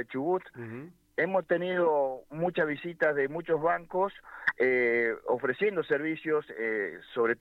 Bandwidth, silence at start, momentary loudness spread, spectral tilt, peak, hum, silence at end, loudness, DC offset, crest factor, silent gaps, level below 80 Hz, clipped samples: 5.6 kHz; 0 s; 7 LU; -7.5 dB/octave; -14 dBFS; none; 0.05 s; -29 LUFS; under 0.1%; 16 dB; none; -68 dBFS; under 0.1%